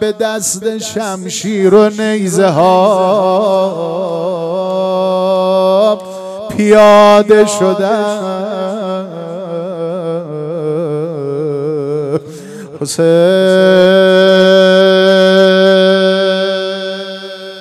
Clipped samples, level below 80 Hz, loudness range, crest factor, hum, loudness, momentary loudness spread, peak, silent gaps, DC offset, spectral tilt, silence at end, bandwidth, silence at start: 0.4%; -56 dBFS; 11 LU; 10 dB; none; -11 LUFS; 14 LU; 0 dBFS; none; under 0.1%; -5 dB/octave; 0 s; 14.5 kHz; 0 s